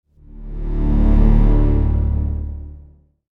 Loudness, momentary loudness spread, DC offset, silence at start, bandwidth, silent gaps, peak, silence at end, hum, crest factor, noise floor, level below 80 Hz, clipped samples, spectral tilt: -18 LUFS; 18 LU; under 0.1%; 0.35 s; 3 kHz; none; -2 dBFS; 0.55 s; none; 14 dB; -45 dBFS; -18 dBFS; under 0.1%; -11 dB/octave